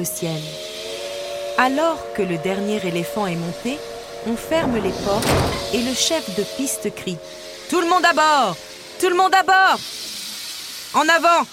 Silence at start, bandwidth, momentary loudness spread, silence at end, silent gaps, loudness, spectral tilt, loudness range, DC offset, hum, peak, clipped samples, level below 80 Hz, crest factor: 0 s; 16.5 kHz; 15 LU; 0 s; none; -20 LUFS; -3.5 dB/octave; 5 LU; under 0.1%; none; -4 dBFS; under 0.1%; -44 dBFS; 18 dB